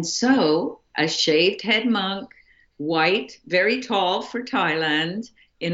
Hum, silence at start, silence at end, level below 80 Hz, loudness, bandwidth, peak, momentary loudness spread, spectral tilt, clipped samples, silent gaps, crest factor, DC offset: none; 0 s; 0 s; -66 dBFS; -21 LUFS; 8 kHz; -6 dBFS; 10 LU; -3.5 dB/octave; under 0.1%; none; 16 dB; under 0.1%